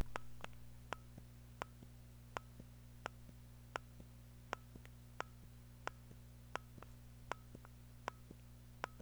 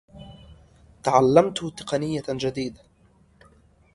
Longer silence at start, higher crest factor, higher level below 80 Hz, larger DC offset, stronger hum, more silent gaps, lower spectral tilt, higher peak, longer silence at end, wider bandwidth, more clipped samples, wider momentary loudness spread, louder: second, 0 s vs 0.15 s; first, 32 dB vs 22 dB; second, -62 dBFS vs -54 dBFS; neither; first, 60 Hz at -60 dBFS vs none; neither; second, -4.5 dB/octave vs -6 dB/octave; second, -20 dBFS vs -2 dBFS; second, 0 s vs 1.25 s; first, over 20 kHz vs 11.5 kHz; neither; second, 9 LU vs 17 LU; second, -54 LUFS vs -23 LUFS